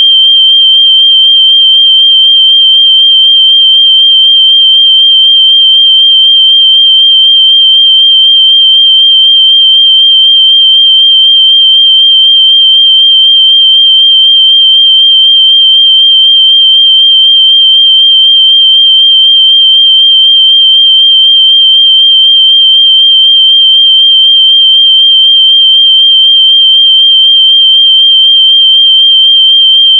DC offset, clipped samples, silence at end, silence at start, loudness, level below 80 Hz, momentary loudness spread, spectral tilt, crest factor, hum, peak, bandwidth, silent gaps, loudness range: under 0.1%; 0.5%; 0 s; 0 s; 0 LUFS; under -90 dBFS; 0 LU; 17.5 dB/octave; 4 dB; none; 0 dBFS; 3.4 kHz; none; 0 LU